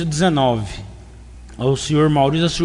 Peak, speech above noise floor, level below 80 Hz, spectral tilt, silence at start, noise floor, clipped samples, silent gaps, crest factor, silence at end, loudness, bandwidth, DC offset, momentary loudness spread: -4 dBFS; 21 dB; -38 dBFS; -5.5 dB/octave; 0 s; -38 dBFS; under 0.1%; none; 14 dB; 0 s; -17 LUFS; 11 kHz; under 0.1%; 16 LU